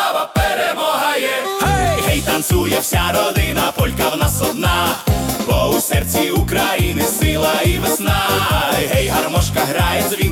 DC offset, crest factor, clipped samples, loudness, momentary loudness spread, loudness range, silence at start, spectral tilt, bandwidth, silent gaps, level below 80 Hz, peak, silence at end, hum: under 0.1%; 14 dB; under 0.1%; -16 LUFS; 2 LU; 1 LU; 0 s; -4 dB/octave; 18 kHz; none; -28 dBFS; -2 dBFS; 0 s; none